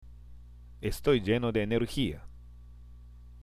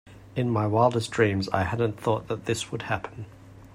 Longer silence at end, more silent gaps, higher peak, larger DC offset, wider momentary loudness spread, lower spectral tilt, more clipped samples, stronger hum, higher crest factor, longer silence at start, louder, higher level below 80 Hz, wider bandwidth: about the same, 0 s vs 0.1 s; neither; second, -12 dBFS vs -8 dBFS; neither; about the same, 11 LU vs 12 LU; about the same, -6.5 dB/octave vs -6 dB/octave; neither; first, 60 Hz at -45 dBFS vs none; about the same, 20 dB vs 20 dB; about the same, 0 s vs 0.05 s; second, -30 LUFS vs -26 LUFS; first, -46 dBFS vs -56 dBFS; about the same, 15.5 kHz vs 15 kHz